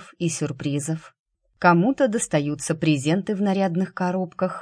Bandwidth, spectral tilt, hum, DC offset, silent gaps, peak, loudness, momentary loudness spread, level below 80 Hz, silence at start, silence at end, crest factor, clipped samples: 10.5 kHz; -5.5 dB/octave; none; under 0.1%; 1.19-1.26 s; -4 dBFS; -23 LUFS; 8 LU; -62 dBFS; 0 s; 0 s; 20 dB; under 0.1%